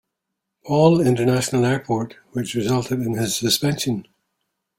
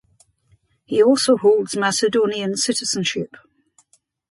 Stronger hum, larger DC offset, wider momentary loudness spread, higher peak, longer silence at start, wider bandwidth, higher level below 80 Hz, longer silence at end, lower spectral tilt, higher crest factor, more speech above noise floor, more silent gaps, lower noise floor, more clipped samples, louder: neither; neither; about the same, 10 LU vs 8 LU; about the same, -2 dBFS vs -4 dBFS; second, 0.65 s vs 0.9 s; first, 16.5 kHz vs 11.5 kHz; first, -54 dBFS vs -66 dBFS; second, 0.75 s vs 1.05 s; first, -5 dB/octave vs -3.5 dB/octave; about the same, 18 dB vs 16 dB; first, 61 dB vs 44 dB; neither; first, -80 dBFS vs -62 dBFS; neither; about the same, -20 LUFS vs -18 LUFS